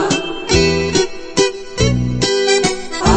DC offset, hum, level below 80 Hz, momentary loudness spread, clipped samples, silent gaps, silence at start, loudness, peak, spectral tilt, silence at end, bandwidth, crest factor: under 0.1%; none; -28 dBFS; 5 LU; under 0.1%; none; 0 s; -16 LUFS; 0 dBFS; -4 dB/octave; 0 s; 8.8 kHz; 14 dB